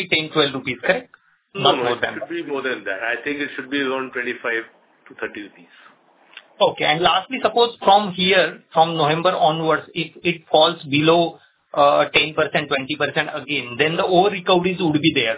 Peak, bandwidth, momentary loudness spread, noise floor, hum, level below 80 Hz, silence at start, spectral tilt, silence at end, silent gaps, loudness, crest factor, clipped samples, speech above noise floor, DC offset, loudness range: 0 dBFS; 4 kHz; 9 LU; -47 dBFS; none; -58 dBFS; 0 s; -9 dB/octave; 0 s; none; -19 LUFS; 20 dB; under 0.1%; 27 dB; under 0.1%; 7 LU